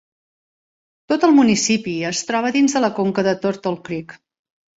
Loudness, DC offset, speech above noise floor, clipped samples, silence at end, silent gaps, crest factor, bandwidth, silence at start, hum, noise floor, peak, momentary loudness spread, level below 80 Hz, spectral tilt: -18 LUFS; under 0.1%; over 72 dB; under 0.1%; 0.6 s; none; 18 dB; 8 kHz; 1.1 s; none; under -90 dBFS; -2 dBFS; 12 LU; -60 dBFS; -4 dB/octave